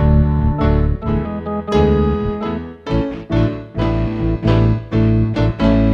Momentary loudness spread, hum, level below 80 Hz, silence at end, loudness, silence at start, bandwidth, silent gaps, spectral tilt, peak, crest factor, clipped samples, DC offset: 7 LU; none; -22 dBFS; 0 s; -17 LUFS; 0 s; 6.6 kHz; none; -9.5 dB/octave; -2 dBFS; 14 dB; under 0.1%; under 0.1%